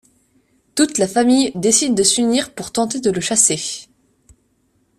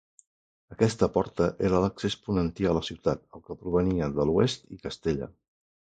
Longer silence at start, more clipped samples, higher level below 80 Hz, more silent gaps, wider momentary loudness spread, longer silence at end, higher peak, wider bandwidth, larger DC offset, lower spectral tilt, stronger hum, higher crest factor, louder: about the same, 0.75 s vs 0.7 s; neither; second, -56 dBFS vs -46 dBFS; neither; about the same, 10 LU vs 12 LU; first, 1.15 s vs 0.65 s; first, 0 dBFS vs -8 dBFS; first, 14 kHz vs 9.2 kHz; neither; second, -2.5 dB/octave vs -6.5 dB/octave; neither; about the same, 18 dB vs 20 dB; first, -16 LUFS vs -28 LUFS